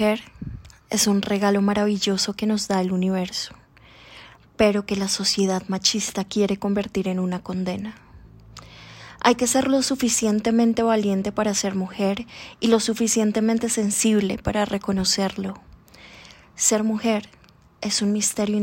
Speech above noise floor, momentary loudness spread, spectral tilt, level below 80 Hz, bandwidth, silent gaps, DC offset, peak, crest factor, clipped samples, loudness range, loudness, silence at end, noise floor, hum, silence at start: 28 dB; 12 LU; -4 dB/octave; -50 dBFS; 16.5 kHz; none; under 0.1%; -4 dBFS; 18 dB; under 0.1%; 3 LU; -22 LUFS; 0 s; -49 dBFS; none; 0 s